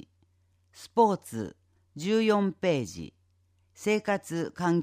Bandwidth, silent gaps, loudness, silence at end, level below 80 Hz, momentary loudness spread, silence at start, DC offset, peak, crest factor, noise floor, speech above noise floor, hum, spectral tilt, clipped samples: 15.5 kHz; none; -28 LUFS; 0 s; -68 dBFS; 18 LU; 0.8 s; under 0.1%; -10 dBFS; 20 dB; -68 dBFS; 40 dB; none; -6 dB/octave; under 0.1%